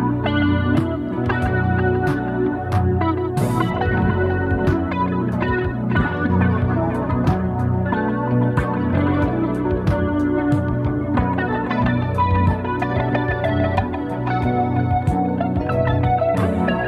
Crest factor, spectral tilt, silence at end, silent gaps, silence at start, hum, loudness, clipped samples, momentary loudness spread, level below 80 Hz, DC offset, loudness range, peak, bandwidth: 14 dB; -8.5 dB/octave; 0 s; none; 0 s; none; -20 LUFS; under 0.1%; 3 LU; -34 dBFS; under 0.1%; 0 LU; -4 dBFS; 12.5 kHz